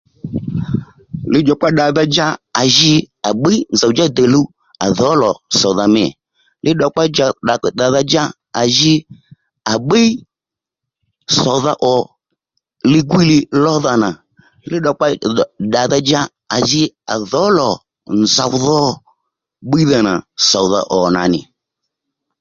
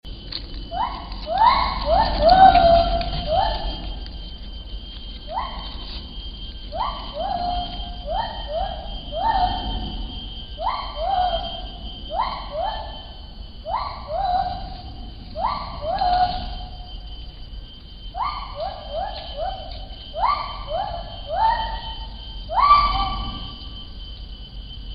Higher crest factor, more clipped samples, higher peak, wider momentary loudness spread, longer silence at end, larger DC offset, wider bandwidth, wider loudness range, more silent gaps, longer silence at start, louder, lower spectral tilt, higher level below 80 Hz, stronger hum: second, 14 dB vs 22 dB; neither; about the same, 0 dBFS vs 0 dBFS; second, 10 LU vs 20 LU; first, 0.95 s vs 0 s; neither; first, 7.6 kHz vs 5.4 kHz; second, 3 LU vs 12 LU; neither; first, 0.25 s vs 0.05 s; first, -14 LUFS vs -23 LUFS; second, -4.5 dB/octave vs -8 dB/octave; second, -48 dBFS vs -32 dBFS; neither